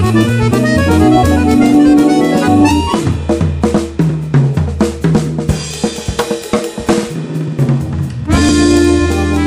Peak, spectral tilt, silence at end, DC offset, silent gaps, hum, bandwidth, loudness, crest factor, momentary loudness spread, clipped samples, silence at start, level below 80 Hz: 0 dBFS; -6.5 dB/octave; 0 s; under 0.1%; none; none; 15.5 kHz; -12 LUFS; 10 dB; 9 LU; under 0.1%; 0 s; -26 dBFS